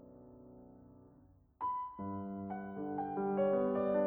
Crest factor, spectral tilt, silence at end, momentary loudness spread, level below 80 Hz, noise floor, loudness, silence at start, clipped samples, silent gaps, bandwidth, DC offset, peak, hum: 16 dB; -11 dB/octave; 0 s; 24 LU; -70 dBFS; -64 dBFS; -38 LUFS; 0 s; under 0.1%; none; 3.8 kHz; under 0.1%; -22 dBFS; none